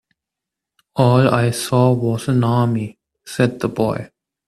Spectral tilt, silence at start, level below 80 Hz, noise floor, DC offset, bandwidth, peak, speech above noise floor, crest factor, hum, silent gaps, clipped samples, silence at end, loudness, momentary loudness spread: -6.5 dB/octave; 0.95 s; -52 dBFS; -84 dBFS; under 0.1%; 13.5 kHz; 0 dBFS; 68 dB; 18 dB; none; none; under 0.1%; 0.4 s; -18 LUFS; 13 LU